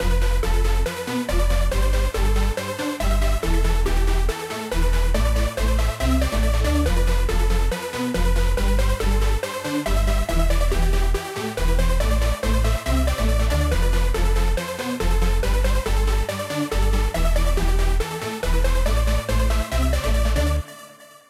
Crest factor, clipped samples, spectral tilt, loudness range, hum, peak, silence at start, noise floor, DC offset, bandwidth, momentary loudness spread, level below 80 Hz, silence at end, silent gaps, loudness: 12 dB; under 0.1%; -5 dB/octave; 1 LU; none; -8 dBFS; 0 s; -44 dBFS; under 0.1%; 15 kHz; 4 LU; -20 dBFS; 0.4 s; none; -23 LUFS